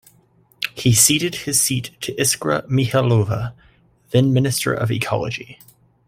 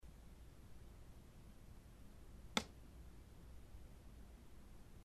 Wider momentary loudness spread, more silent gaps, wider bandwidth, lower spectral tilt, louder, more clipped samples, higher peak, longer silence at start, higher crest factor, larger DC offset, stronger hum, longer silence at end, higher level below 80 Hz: second, 14 LU vs 19 LU; neither; first, 16 kHz vs 13 kHz; about the same, -4 dB/octave vs -3.5 dB/octave; first, -18 LUFS vs -54 LUFS; neither; first, 0 dBFS vs -20 dBFS; first, 0.6 s vs 0 s; second, 20 dB vs 34 dB; neither; neither; first, 0.55 s vs 0 s; first, -50 dBFS vs -60 dBFS